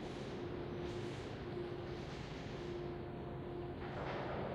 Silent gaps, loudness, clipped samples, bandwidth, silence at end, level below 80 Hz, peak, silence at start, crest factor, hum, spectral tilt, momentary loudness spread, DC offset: none; -45 LUFS; under 0.1%; 11 kHz; 0 s; -58 dBFS; -28 dBFS; 0 s; 16 dB; none; -7 dB/octave; 4 LU; under 0.1%